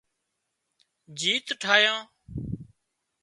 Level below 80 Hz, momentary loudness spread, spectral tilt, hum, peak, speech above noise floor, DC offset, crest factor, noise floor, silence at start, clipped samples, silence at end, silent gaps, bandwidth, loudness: -54 dBFS; 20 LU; -2 dB/octave; none; -4 dBFS; 55 dB; under 0.1%; 26 dB; -80 dBFS; 1.1 s; under 0.1%; 0.6 s; none; 11.5 kHz; -24 LUFS